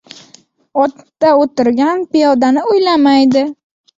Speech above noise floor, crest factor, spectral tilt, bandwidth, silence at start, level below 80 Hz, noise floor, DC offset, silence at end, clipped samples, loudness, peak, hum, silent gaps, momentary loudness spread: 36 dB; 12 dB; -5 dB/octave; 7.8 kHz; 0.75 s; -58 dBFS; -47 dBFS; under 0.1%; 0.45 s; under 0.1%; -12 LUFS; -2 dBFS; none; none; 6 LU